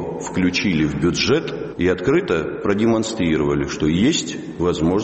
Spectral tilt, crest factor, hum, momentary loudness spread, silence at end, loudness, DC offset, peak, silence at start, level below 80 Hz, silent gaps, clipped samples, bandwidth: -5 dB/octave; 16 dB; none; 5 LU; 0 s; -19 LUFS; under 0.1%; -4 dBFS; 0 s; -42 dBFS; none; under 0.1%; 8.4 kHz